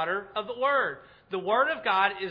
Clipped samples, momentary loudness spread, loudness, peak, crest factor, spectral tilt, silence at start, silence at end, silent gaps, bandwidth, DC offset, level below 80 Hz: under 0.1%; 10 LU; -27 LUFS; -8 dBFS; 20 dB; -6 dB/octave; 0 s; 0 s; none; 5.2 kHz; under 0.1%; -70 dBFS